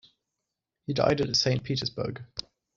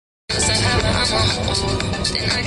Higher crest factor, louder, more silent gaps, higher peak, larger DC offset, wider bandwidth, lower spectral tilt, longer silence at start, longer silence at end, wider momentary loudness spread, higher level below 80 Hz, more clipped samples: first, 22 dB vs 14 dB; second, -27 LUFS vs -18 LUFS; neither; about the same, -8 dBFS vs -6 dBFS; neither; second, 7.6 kHz vs 11.5 kHz; about the same, -4 dB/octave vs -3.5 dB/octave; first, 0.9 s vs 0.3 s; first, 0.35 s vs 0 s; first, 15 LU vs 4 LU; second, -56 dBFS vs -30 dBFS; neither